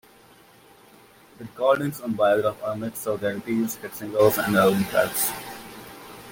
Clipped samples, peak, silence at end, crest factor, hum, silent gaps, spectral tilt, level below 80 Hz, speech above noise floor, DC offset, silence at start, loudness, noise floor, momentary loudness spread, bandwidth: under 0.1%; -6 dBFS; 0 s; 20 dB; none; none; -4.5 dB/octave; -60 dBFS; 30 dB; under 0.1%; 1.4 s; -23 LUFS; -53 dBFS; 21 LU; 17 kHz